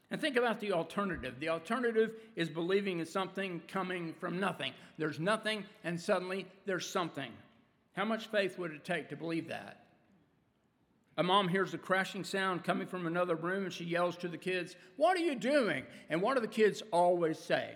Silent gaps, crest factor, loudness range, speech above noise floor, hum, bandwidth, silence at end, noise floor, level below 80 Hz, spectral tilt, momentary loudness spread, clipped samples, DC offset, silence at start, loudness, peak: none; 20 dB; 5 LU; 39 dB; none; 17.5 kHz; 0 s; -74 dBFS; -72 dBFS; -5 dB/octave; 10 LU; under 0.1%; under 0.1%; 0.1 s; -35 LUFS; -16 dBFS